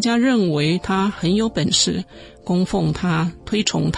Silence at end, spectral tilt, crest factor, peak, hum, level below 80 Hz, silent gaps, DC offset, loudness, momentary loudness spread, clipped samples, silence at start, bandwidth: 0 s; -4.5 dB/octave; 16 dB; -4 dBFS; none; -44 dBFS; none; under 0.1%; -19 LUFS; 6 LU; under 0.1%; 0 s; 11 kHz